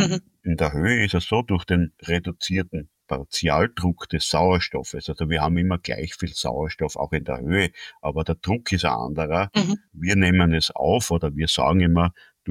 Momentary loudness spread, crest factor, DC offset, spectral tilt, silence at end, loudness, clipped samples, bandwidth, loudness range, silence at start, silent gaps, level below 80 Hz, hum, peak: 10 LU; 16 dB; under 0.1%; -5 dB/octave; 0 s; -23 LUFS; under 0.1%; 14.5 kHz; 4 LU; 0 s; none; -38 dBFS; none; -6 dBFS